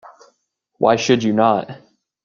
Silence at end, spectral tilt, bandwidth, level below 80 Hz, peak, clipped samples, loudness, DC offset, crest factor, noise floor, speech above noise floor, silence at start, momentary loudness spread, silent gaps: 0.5 s; -5 dB/octave; 7.2 kHz; -62 dBFS; 0 dBFS; under 0.1%; -17 LUFS; under 0.1%; 18 dB; -69 dBFS; 53 dB; 0.8 s; 7 LU; none